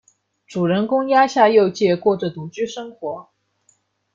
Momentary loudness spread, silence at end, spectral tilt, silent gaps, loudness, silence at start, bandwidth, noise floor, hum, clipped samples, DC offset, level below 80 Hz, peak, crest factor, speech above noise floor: 16 LU; 0.9 s; -6 dB/octave; none; -18 LUFS; 0.5 s; 7.6 kHz; -63 dBFS; none; under 0.1%; under 0.1%; -64 dBFS; -2 dBFS; 18 dB; 45 dB